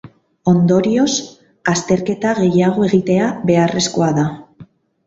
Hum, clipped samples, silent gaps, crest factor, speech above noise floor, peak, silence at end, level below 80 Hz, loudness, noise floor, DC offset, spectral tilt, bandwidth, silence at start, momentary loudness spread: none; under 0.1%; none; 16 dB; 29 dB; 0 dBFS; 0.45 s; -52 dBFS; -16 LUFS; -43 dBFS; under 0.1%; -5.5 dB/octave; 8 kHz; 0.05 s; 8 LU